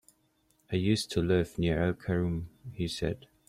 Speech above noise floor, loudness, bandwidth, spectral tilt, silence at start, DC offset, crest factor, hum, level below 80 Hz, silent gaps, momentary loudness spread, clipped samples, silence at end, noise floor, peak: 41 dB; -31 LUFS; 14.5 kHz; -6 dB/octave; 0.7 s; under 0.1%; 18 dB; none; -50 dBFS; none; 8 LU; under 0.1%; 0.3 s; -71 dBFS; -14 dBFS